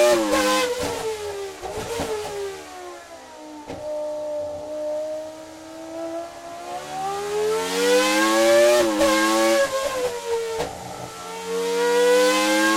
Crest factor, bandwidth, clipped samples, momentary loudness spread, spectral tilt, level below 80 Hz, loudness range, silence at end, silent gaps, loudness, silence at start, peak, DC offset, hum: 14 dB; 16.5 kHz; under 0.1%; 19 LU; -2.5 dB/octave; -52 dBFS; 12 LU; 0 s; none; -22 LUFS; 0 s; -8 dBFS; under 0.1%; none